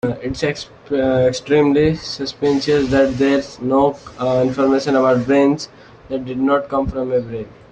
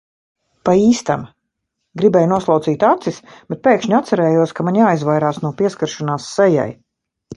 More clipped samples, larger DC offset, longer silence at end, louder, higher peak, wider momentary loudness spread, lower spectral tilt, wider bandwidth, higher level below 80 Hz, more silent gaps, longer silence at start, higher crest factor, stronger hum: neither; neither; first, 0.25 s vs 0 s; about the same, -17 LUFS vs -16 LUFS; second, -4 dBFS vs 0 dBFS; about the same, 10 LU vs 9 LU; about the same, -6 dB/octave vs -6.5 dB/octave; second, 8.8 kHz vs 11 kHz; first, -42 dBFS vs -56 dBFS; neither; second, 0.05 s vs 0.65 s; about the same, 14 dB vs 16 dB; neither